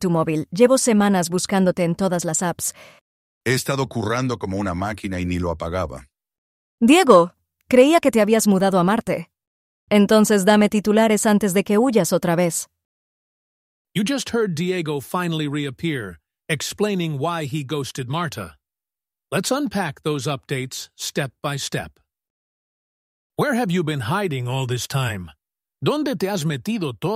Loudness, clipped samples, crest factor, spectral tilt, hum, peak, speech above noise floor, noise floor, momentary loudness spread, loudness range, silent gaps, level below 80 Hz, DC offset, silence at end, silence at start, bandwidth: -20 LUFS; under 0.1%; 20 dB; -5 dB/octave; none; -2 dBFS; over 70 dB; under -90 dBFS; 12 LU; 9 LU; 3.01-3.41 s, 6.38-6.78 s, 9.47-9.87 s, 12.85-13.85 s, 22.30-23.30 s; -52 dBFS; under 0.1%; 0 s; 0 s; 16 kHz